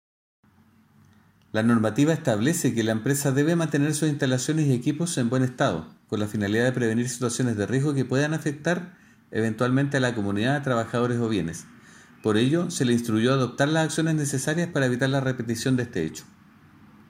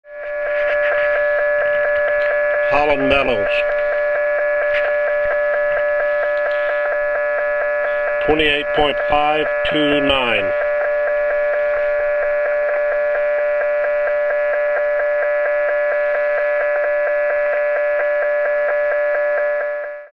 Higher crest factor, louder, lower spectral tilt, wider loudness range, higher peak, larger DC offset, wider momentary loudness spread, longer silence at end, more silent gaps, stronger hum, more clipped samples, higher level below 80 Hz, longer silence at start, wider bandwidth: about the same, 16 dB vs 16 dB; second, -24 LUFS vs -17 LUFS; about the same, -5.5 dB/octave vs -5.5 dB/octave; about the same, 2 LU vs 2 LU; second, -8 dBFS vs 0 dBFS; second, under 0.1% vs 0.3%; first, 6 LU vs 3 LU; first, 0.85 s vs 0.05 s; neither; neither; neither; second, -62 dBFS vs -44 dBFS; first, 1.55 s vs 0.05 s; first, 16 kHz vs 5.4 kHz